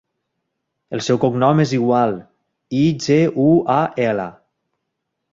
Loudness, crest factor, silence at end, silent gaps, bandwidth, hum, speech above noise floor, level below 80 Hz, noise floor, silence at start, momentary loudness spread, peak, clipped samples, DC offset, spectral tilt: -17 LUFS; 16 dB; 1 s; none; 7.8 kHz; none; 60 dB; -56 dBFS; -76 dBFS; 0.9 s; 10 LU; -2 dBFS; under 0.1%; under 0.1%; -7 dB/octave